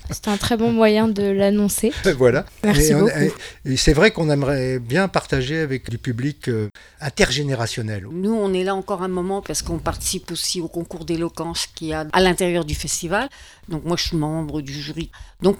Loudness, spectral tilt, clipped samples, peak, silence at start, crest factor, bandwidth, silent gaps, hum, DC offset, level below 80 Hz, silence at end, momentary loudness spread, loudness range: -20 LUFS; -4.5 dB/octave; under 0.1%; 0 dBFS; 0.05 s; 20 dB; 18 kHz; none; none; under 0.1%; -36 dBFS; 0 s; 12 LU; 6 LU